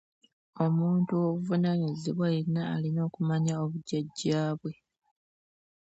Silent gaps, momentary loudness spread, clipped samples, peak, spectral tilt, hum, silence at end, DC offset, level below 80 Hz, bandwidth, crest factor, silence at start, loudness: none; 6 LU; under 0.1%; -14 dBFS; -7.5 dB/octave; none; 1.2 s; under 0.1%; -70 dBFS; 8 kHz; 16 dB; 0.55 s; -30 LUFS